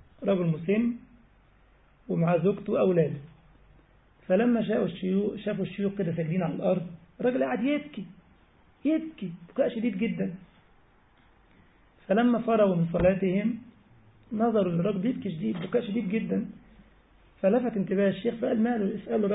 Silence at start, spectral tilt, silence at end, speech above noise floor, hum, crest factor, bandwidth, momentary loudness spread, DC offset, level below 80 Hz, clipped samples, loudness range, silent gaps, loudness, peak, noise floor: 0.2 s; -11.5 dB/octave; 0 s; 34 dB; none; 16 dB; 4 kHz; 9 LU; under 0.1%; -56 dBFS; under 0.1%; 4 LU; none; -28 LUFS; -12 dBFS; -60 dBFS